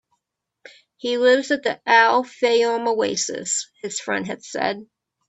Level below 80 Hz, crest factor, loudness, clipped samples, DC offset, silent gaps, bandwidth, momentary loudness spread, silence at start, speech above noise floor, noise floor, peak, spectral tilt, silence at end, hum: -70 dBFS; 20 dB; -20 LUFS; under 0.1%; under 0.1%; none; 8.4 kHz; 13 LU; 1.05 s; 58 dB; -79 dBFS; -2 dBFS; -2 dB/octave; 0.45 s; none